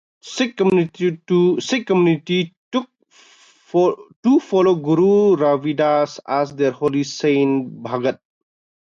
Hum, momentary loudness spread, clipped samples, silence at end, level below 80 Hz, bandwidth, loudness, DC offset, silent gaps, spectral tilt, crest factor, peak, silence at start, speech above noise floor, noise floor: none; 8 LU; under 0.1%; 0.65 s; -64 dBFS; 7.6 kHz; -18 LUFS; under 0.1%; 2.57-2.71 s, 4.16-4.23 s; -6.5 dB/octave; 14 dB; -4 dBFS; 0.25 s; 35 dB; -52 dBFS